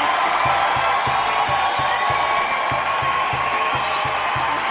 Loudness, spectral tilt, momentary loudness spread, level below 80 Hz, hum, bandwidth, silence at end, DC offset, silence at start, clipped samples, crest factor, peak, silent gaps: -19 LUFS; -7 dB/octave; 3 LU; -46 dBFS; none; 4 kHz; 0 s; under 0.1%; 0 s; under 0.1%; 12 dB; -8 dBFS; none